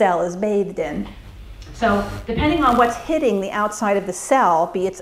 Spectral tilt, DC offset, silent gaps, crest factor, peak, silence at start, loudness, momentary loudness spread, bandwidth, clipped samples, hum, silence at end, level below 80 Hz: -5 dB/octave; under 0.1%; none; 18 dB; -2 dBFS; 0 s; -19 LUFS; 10 LU; 16 kHz; under 0.1%; none; 0 s; -38 dBFS